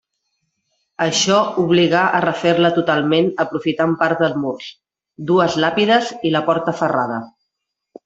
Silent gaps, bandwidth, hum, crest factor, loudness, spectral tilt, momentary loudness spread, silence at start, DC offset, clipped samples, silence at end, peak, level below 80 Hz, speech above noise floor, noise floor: none; 8 kHz; none; 16 dB; -17 LUFS; -4.5 dB/octave; 9 LU; 1 s; under 0.1%; under 0.1%; 0.75 s; -2 dBFS; -60 dBFS; 62 dB; -78 dBFS